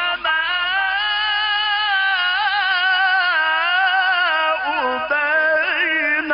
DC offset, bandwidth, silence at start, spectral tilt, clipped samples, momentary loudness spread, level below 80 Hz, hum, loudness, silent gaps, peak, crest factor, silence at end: under 0.1%; 5.4 kHz; 0 s; -5 dB/octave; under 0.1%; 3 LU; -56 dBFS; none; -17 LUFS; none; -6 dBFS; 12 dB; 0 s